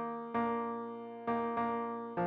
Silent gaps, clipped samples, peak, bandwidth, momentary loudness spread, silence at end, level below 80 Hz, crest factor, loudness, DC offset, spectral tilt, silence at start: none; under 0.1%; -24 dBFS; 4.8 kHz; 7 LU; 0 s; -72 dBFS; 12 dB; -37 LUFS; under 0.1%; -9 dB/octave; 0 s